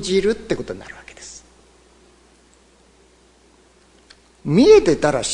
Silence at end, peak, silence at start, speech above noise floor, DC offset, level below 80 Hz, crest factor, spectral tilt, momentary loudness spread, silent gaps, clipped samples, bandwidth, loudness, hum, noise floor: 0 s; -2 dBFS; 0 s; 37 dB; under 0.1%; -46 dBFS; 20 dB; -5 dB/octave; 26 LU; none; under 0.1%; 10.5 kHz; -16 LUFS; 60 Hz at -55 dBFS; -53 dBFS